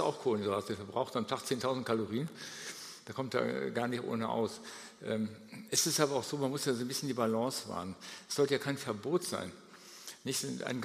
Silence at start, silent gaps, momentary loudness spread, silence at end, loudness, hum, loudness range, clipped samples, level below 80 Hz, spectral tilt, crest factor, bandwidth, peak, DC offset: 0 s; none; 13 LU; 0 s; -35 LUFS; none; 3 LU; under 0.1%; -78 dBFS; -4 dB/octave; 22 dB; 15.5 kHz; -12 dBFS; under 0.1%